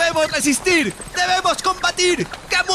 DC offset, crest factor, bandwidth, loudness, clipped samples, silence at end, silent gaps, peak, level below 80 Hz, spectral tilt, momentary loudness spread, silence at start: under 0.1%; 14 dB; 14.5 kHz; -18 LUFS; under 0.1%; 0 s; none; -6 dBFS; -44 dBFS; -2 dB/octave; 5 LU; 0 s